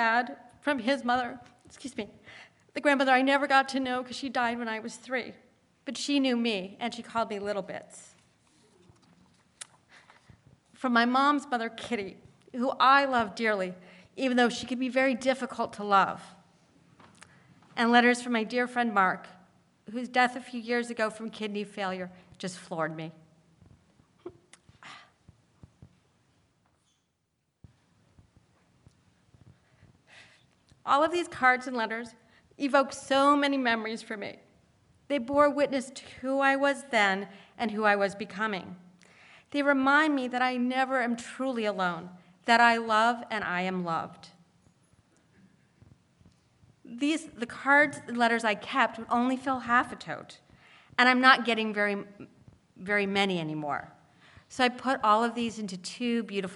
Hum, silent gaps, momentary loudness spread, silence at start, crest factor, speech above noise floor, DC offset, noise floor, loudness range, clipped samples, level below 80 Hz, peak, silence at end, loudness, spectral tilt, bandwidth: none; none; 18 LU; 0 s; 24 dB; 50 dB; under 0.1%; -78 dBFS; 10 LU; under 0.1%; -72 dBFS; -6 dBFS; 0 s; -27 LUFS; -4 dB/octave; 11.5 kHz